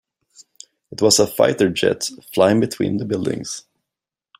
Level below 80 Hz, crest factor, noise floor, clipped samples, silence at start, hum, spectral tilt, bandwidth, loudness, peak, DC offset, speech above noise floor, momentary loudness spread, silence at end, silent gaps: -58 dBFS; 18 dB; -86 dBFS; under 0.1%; 0.9 s; none; -4 dB/octave; 16 kHz; -18 LUFS; -2 dBFS; under 0.1%; 68 dB; 13 LU; 0.8 s; none